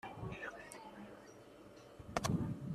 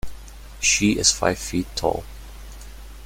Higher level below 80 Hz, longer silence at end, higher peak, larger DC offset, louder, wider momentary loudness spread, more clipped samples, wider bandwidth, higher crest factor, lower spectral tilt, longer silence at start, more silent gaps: second, -62 dBFS vs -38 dBFS; about the same, 0 s vs 0 s; second, -18 dBFS vs -2 dBFS; neither; second, -43 LUFS vs -21 LUFS; second, 19 LU vs 24 LU; neither; second, 14 kHz vs 16.5 kHz; first, 28 dB vs 22 dB; first, -5.5 dB/octave vs -2.5 dB/octave; about the same, 0.05 s vs 0.05 s; neither